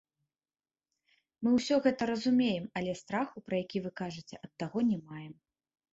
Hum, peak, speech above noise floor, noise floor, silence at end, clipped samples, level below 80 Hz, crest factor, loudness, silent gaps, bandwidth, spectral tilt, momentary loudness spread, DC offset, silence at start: none; -14 dBFS; over 58 dB; under -90 dBFS; 0.6 s; under 0.1%; -70 dBFS; 20 dB; -32 LUFS; none; 7.8 kHz; -6 dB/octave; 17 LU; under 0.1%; 1.4 s